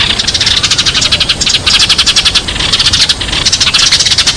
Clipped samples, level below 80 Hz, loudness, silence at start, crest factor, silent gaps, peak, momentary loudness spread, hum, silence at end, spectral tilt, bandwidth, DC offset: 0.4%; -26 dBFS; -6 LUFS; 0 s; 10 dB; none; 0 dBFS; 4 LU; none; 0 s; -0.5 dB/octave; 11 kHz; under 0.1%